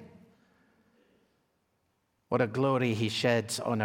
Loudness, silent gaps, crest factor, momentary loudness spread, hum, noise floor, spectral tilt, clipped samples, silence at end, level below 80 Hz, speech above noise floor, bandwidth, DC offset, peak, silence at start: -29 LUFS; none; 20 dB; 4 LU; none; -76 dBFS; -5 dB/octave; under 0.1%; 0 s; -72 dBFS; 47 dB; 17 kHz; under 0.1%; -12 dBFS; 0 s